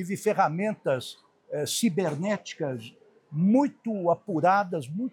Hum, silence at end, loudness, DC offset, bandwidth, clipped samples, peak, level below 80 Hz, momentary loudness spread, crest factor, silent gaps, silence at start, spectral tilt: none; 0.05 s; -27 LUFS; under 0.1%; 18.5 kHz; under 0.1%; -10 dBFS; -80 dBFS; 12 LU; 18 dB; none; 0 s; -5.5 dB/octave